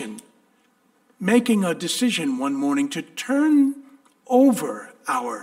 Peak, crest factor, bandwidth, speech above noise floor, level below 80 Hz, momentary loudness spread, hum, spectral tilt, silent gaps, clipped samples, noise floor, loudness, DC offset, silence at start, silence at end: -4 dBFS; 18 dB; 16 kHz; 42 dB; -72 dBFS; 13 LU; none; -4.5 dB/octave; none; under 0.1%; -62 dBFS; -21 LUFS; under 0.1%; 0 s; 0 s